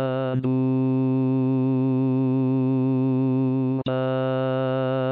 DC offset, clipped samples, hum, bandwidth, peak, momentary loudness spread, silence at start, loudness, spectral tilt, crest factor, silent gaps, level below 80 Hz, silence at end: 0.1%; under 0.1%; none; 4.4 kHz; -14 dBFS; 2 LU; 0 s; -23 LUFS; -8.5 dB/octave; 8 dB; none; -66 dBFS; 0 s